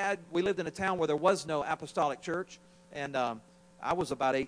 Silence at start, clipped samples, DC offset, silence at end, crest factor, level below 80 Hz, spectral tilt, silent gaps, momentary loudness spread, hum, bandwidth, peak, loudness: 0 s; under 0.1%; under 0.1%; 0 s; 18 dB; -64 dBFS; -5 dB/octave; none; 12 LU; none; 10.5 kHz; -14 dBFS; -32 LUFS